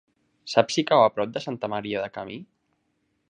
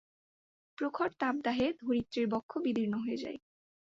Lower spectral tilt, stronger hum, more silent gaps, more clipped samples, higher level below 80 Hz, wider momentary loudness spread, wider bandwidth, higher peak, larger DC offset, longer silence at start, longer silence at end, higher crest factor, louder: second, -4.5 dB/octave vs -6.5 dB/octave; neither; second, none vs 2.43-2.49 s; neither; about the same, -68 dBFS vs -68 dBFS; first, 18 LU vs 7 LU; first, 10 kHz vs 7.6 kHz; first, -4 dBFS vs -18 dBFS; neither; second, 0.45 s vs 0.8 s; first, 0.85 s vs 0.55 s; first, 24 dB vs 16 dB; first, -24 LUFS vs -34 LUFS